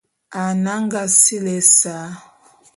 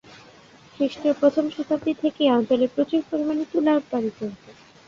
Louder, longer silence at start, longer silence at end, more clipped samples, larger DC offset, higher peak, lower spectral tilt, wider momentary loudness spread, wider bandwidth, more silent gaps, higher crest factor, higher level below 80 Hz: first, -14 LUFS vs -23 LUFS; second, 0.3 s vs 0.8 s; first, 0.6 s vs 0.35 s; neither; neither; first, 0 dBFS vs -6 dBFS; second, -3 dB/octave vs -6 dB/octave; first, 20 LU vs 7 LU; first, 12 kHz vs 7.4 kHz; neither; about the same, 18 dB vs 18 dB; about the same, -68 dBFS vs -64 dBFS